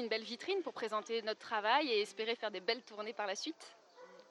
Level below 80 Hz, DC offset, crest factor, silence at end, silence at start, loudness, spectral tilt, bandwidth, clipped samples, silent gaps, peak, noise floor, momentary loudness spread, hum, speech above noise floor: under -90 dBFS; under 0.1%; 20 dB; 0.05 s; 0 s; -38 LUFS; -2 dB/octave; 12 kHz; under 0.1%; none; -18 dBFS; -59 dBFS; 13 LU; none; 20 dB